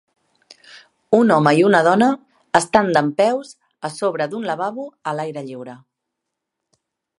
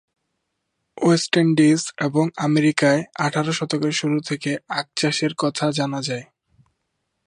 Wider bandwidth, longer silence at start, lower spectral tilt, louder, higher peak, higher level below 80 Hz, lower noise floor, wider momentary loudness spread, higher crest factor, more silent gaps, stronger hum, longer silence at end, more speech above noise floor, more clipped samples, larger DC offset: about the same, 11.5 kHz vs 11.5 kHz; second, 0.75 s vs 0.95 s; about the same, -5.5 dB/octave vs -5 dB/octave; about the same, -18 LUFS vs -20 LUFS; about the same, 0 dBFS vs -2 dBFS; first, -62 dBFS vs -68 dBFS; first, -80 dBFS vs -76 dBFS; first, 17 LU vs 8 LU; about the same, 20 dB vs 20 dB; neither; neither; first, 1.45 s vs 1.05 s; first, 63 dB vs 56 dB; neither; neither